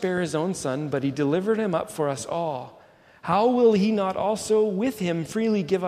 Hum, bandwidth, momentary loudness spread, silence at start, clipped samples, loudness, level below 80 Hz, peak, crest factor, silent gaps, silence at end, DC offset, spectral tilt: none; 15 kHz; 9 LU; 0 s; under 0.1%; -24 LUFS; -62 dBFS; -8 dBFS; 16 dB; none; 0 s; under 0.1%; -6 dB/octave